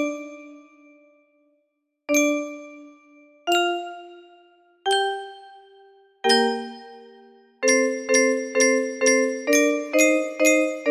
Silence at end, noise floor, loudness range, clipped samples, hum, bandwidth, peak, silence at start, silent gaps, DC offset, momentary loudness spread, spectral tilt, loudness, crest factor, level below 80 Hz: 0 s; -74 dBFS; 8 LU; under 0.1%; none; 15.5 kHz; -4 dBFS; 0 s; none; under 0.1%; 20 LU; -0.5 dB/octave; -21 LUFS; 18 dB; -74 dBFS